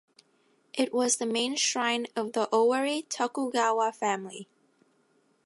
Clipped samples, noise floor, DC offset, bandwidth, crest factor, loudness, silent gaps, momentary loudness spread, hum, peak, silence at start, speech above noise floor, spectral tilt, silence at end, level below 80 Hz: under 0.1%; -68 dBFS; under 0.1%; 11.5 kHz; 18 dB; -28 LUFS; none; 7 LU; none; -12 dBFS; 0.75 s; 41 dB; -2 dB/octave; 1 s; -86 dBFS